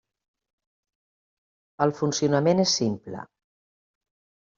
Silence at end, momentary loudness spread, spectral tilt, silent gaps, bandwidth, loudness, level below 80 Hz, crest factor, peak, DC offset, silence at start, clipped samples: 1.3 s; 16 LU; -5 dB/octave; none; 7.6 kHz; -23 LUFS; -66 dBFS; 22 dB; -6 dBFS; under 0.1%; 1.8 s; under 0.1%